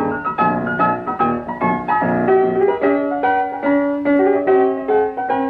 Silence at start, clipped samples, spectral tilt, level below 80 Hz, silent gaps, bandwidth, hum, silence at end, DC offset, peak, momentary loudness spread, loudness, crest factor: 0 s; under 0.1%; -9.5 dB/octave; -52 dBFS; none; 4.6 kHz; none; 0 s; under 0.1%; -4 dBFS; 5 LU; -17 LUFS; 14 dB